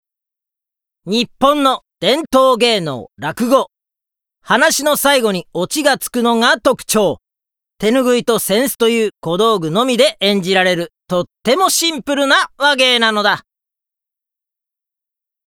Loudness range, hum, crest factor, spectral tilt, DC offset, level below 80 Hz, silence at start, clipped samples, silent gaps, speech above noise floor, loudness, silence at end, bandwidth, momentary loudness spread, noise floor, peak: 2 LU; none; 16 dB; -3 dB/octave; under 0.1%; -54 dBFS; 1.05 s; under 0.1%; none; 71 dB; -14 LUFS; 2.1 s; over 20 kHz; 8 LU; -86 dBFS; 0 dBFS